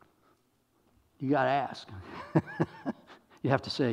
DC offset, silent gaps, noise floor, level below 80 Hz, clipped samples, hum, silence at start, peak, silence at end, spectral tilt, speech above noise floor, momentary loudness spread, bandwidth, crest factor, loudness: under 0.1%; none; -71 dBFS; -68 dBFS; under 0.1%; none; 1.2 s; -10 dBFS; 0 s; -7 dB/octave; 41 dB; 17 LU; 11 kHz; 24 dB; -31 LUFS